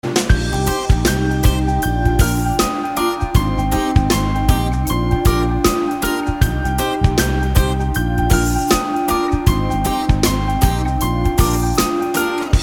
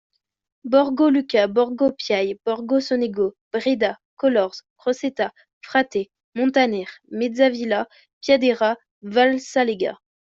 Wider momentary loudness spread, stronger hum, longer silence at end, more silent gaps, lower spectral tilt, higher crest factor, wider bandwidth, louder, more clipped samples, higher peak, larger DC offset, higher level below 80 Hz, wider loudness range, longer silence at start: second, 3 LU vs 10 LU; neither; second, 0 s vs 0.4 s; second, none vs 3.41-3.51 s, 4.05-4.17 s, 4.70-4.76 s, 5.53-5.61 s, 6.24-6.32 s, 8.13-8.21 s, 8.91-9.01 s; about the same, -5.5 dB/octave vs -4.5 dB/octave; about the same, 14 dB vs 18 dB; first, 19 kHz vs 7.6 kHz; first, -17 LUFS vs -21 LUFS; neither; first, 0 dBFS vs -4 dBFS; neither; first, -20 dBFS vs -66 dBFS; second, 0 LU vs 3 LU; second, 0.05 s vs 0.65 s